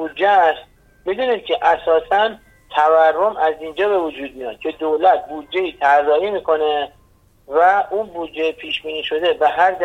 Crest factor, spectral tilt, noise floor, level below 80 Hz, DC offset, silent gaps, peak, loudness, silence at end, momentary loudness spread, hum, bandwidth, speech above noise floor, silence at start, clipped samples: 16 dB; -4.5 dB/octave; -53 dBFS; -54 dBFS; under 0.1%; none; -2 dBFS; -18 LUFS; 0 s; 12 LU; none; 8.8 kHz; 36 dB; 0 s; under 0.1%